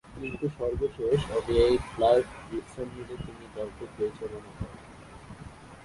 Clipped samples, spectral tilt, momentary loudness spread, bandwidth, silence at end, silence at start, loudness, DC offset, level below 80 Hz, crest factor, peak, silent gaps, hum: under 0.1%; -6.5 dB/octave; 22 LU; 11.5 kHz; 0 s; 0.05 s; -29 LUFS; under 0.1%; -46 dBFS; 20 dB; -10 dBFS; none; none